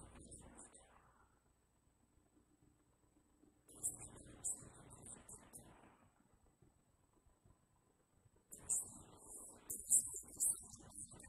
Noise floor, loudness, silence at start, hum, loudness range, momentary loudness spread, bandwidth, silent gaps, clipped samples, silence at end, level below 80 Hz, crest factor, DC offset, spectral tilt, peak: -77 dBFS; -40 LUFS; 0 s; none; 24 LU; 25 LU; 14.5 kHz; none; under 0.1%; 0 s; -72 dBFS; 30 dB; under 0.1%; -1.5 dB/octave; -18 dBFS